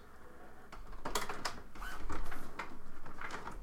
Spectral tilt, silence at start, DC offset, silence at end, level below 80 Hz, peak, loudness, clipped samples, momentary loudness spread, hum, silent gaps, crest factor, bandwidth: -3 dB/octave; 0 s; under 0.1%; 0 s; -46 dBFS; -20 dBFS; -45 LUFS; under 0.1%; 16 LU; none; none; 16 dB; 16.5 kHz